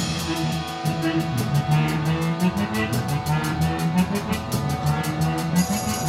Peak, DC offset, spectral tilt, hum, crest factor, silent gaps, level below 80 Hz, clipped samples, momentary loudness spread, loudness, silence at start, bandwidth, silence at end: -8 dBFS; under 0.1%; -5.5 dB/octave; none; 16 dB; none; -42 dBFS; under 0.1%; 4 LU; -23 LUFS; 0 s; 16.5 kHz; 0 s